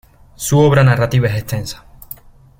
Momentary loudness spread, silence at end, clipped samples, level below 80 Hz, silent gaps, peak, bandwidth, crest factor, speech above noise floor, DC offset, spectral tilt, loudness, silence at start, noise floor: 23 LU; 0.85 s; under 0.1%; -40 dBFS; none; 0 dBFS; 17 kHz; 16 dB; 24 dB; under 0.1%; -6 dB/octave; -14 LUFS; 0.4 s; -38 dBFS